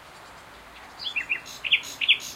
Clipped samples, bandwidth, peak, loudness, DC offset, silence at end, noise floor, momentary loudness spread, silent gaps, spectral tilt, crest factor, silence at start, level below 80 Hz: under 0.1%; 16.5 kHz; -6 dBFS; -25 LUFS; under 0.1%; 0 s; -46 dBFS; 24 LU; none; 1 dB/octave; 24 dB; 0 s; -62 dBFS